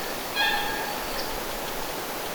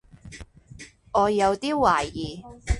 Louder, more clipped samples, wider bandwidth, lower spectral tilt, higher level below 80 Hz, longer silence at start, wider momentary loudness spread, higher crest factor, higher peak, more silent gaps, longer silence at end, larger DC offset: second, -28 LUFS vs -23 LUFS; neither; first, over 20 kHz vs 11.5 kHz; second, -1.5 dB/octave vs -5 dB/octave; second, -44 dBFS vs -38 dBFS; second, 0 s vs 0.25 s; second, 7 LU vs 24 LU; about the same, 18 dB vs 20 dB; second, -12 dBFS vs -6 dBFS; neither; about the same, 0 s vs 0 s; neither